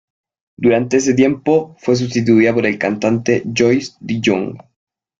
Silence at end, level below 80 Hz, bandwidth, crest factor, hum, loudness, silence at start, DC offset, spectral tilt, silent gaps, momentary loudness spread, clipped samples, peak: 0.6 s; -54 dBFS; 7.8 kHz; 14 dB; none; -15 LUFS; 0.6 s; under 0.1%; -5.5 dB/octave; none; 6 LU; under 0.1%; -2 dBFS